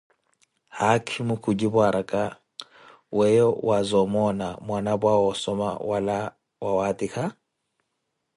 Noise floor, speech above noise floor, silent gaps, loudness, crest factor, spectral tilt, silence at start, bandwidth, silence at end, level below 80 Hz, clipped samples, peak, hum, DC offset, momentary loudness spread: -78 dBFS; 55 dB; none; -24 LUFS; 20 dB; -6 dB/octave; 0.75 s; 11.5 kHz; 1.05 s; -58 dBFS; under 0.1%; -6 dBFS; none; under 0.1%; 11 LU